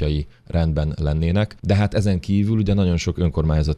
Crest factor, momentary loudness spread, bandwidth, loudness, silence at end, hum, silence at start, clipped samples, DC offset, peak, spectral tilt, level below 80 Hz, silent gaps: 14 dB; 4 LU; 10.5 kHz; -21 LUFS; 0 s; none; 0 s; under 0.1%; under 0.1%; -6 dBFS; -7.5 dB/octave; -28 dBFS; none